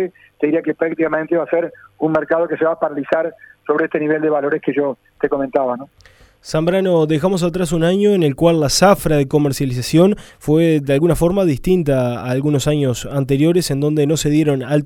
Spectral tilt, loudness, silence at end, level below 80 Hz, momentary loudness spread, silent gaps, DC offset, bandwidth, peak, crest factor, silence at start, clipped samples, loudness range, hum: -6 dB/octave; -17 LUFS; 0 s; -40 dBFS; 7 LU; none; under 0.1%; 17.5 kHz; 0 dBFS; 16 dB; 0 s; under 0.1%; 4 LU; none